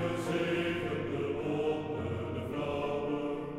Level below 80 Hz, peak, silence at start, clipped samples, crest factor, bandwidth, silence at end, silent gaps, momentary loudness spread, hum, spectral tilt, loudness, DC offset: -58 dBFS; -20 dBFS; 0 s; under 0.1%; 12 dB; 14.5 kHz; 0 s; none; 4 LU; none; -6.5 dB/octave; -34 LUFS; under 0.1%